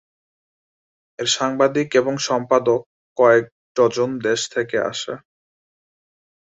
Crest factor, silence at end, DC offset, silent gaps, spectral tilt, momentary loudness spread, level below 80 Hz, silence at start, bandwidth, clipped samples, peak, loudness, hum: 18 dB; 1.4 s; under 0.1%; 2.86-3.16 s, 3.52-3.75 s; -3.5 dB/octave; 12 LU; -64 dBFS; 1.2 s; 8 kHz; under 0.1%; -2 dBFS; -19 LUFS; none